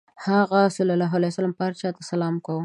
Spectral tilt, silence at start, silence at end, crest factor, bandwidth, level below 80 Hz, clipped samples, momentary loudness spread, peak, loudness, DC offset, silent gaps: -7 dB/octave; 0.2 s; 0 s; 16 dB; 11 kHz; -72 dBFS; under 0.1%; 7 LU; -6 dBFS; -23 LUFS; under 0.1%; none